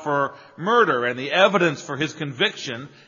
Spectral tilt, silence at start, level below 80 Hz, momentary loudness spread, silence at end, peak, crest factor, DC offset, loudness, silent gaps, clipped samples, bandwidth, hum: -2.5 dB/octave; 0 s; -70 dBFS; 11 LU; 0.2 s; -2 dBFS; 20 dB; under 0.1%; -21 LUFS; none; under 0.1%; 7.4 kHz; none